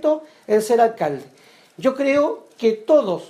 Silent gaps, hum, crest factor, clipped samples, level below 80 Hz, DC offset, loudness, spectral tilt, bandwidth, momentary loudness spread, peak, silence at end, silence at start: none; none; 16 dB; under 0.1%; -70 dBFS; under 0.1%; -20 LUFS; -5.5 dB/octave; 15.5 kHz; 9 LU; -4 dBFS; 0.05 s; 0 s